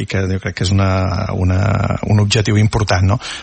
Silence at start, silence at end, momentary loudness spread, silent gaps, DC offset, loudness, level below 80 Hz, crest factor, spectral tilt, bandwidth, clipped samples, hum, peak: 0 s; 0 s; 5 LU; none; under 0.1%; -16 LUFS; -36 dBFS; 12 dB; -6 dB/octave; 8.8 kHz; under 0.1%; none; -2 dBFS